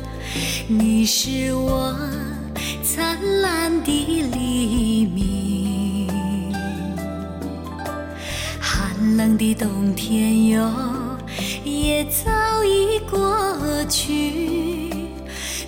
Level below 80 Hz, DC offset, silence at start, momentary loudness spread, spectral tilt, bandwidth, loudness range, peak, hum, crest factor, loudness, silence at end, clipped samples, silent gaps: -34 dBFS; under 0.1%; 0 s; 11 LU; -4.5 dB/octave; 17.5 kHz; 4 LU; -8 dBFS; none; 14 dB; -21 LUFS; 0 s; under 0.1%; none